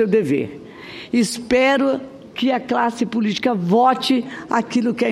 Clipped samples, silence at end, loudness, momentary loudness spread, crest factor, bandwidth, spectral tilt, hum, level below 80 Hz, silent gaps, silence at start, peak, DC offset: under 0.1%; 0 s; -19 LUFS; 12 LU; 14 dB; 14 kHz; -5 dB/octave; none; -56 dBFS; none; 0 s; -4 dBFS; under 0.1%